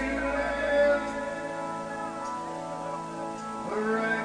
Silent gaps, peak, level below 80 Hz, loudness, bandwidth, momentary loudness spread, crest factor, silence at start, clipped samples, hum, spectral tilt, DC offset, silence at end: none; -14 dBFS; -50 dBFS; -30 LUFS; 10 kHz; 11 LU; 16 dB; 0 s; under 0.1%; none; -5 dB/octave; under 0.1%; 0 s